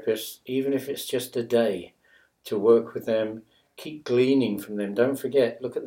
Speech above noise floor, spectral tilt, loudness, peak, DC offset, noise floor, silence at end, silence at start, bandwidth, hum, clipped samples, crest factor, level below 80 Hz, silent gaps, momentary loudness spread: 35 dB; -5.5 dB/octave; -25 LUFS; -8 dBFS; under 0.1%; -60 dBFS; 0 s; 0 s; 17 kHz; none; under 0.1%; 18 dB; -72 dBFS; none; 14 LU